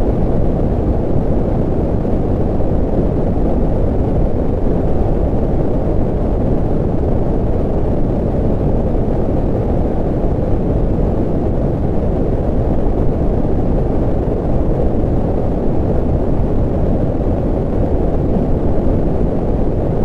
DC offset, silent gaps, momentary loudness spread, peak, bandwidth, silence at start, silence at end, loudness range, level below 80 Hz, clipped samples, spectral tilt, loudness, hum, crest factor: under 0.1%; none; 1 LU; -2 dBFS; 4.2 kHz; 0 s; 0 s; 0 LU; -18 dBFS; under 0.1%; -11 dB/octave; -17 LUFS; none; 12 dB